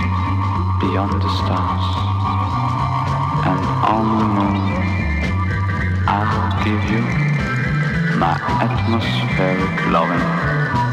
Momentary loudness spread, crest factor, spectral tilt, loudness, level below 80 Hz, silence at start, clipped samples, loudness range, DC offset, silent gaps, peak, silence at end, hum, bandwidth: 3 LU; 16 dB; -7.5 dB/octave; -18 LUFS; -32 dBFS; 0 s; under 0.1%; 1 LU; under 0.1%; none; -2 dBFS; 0 s; none; 9 kHz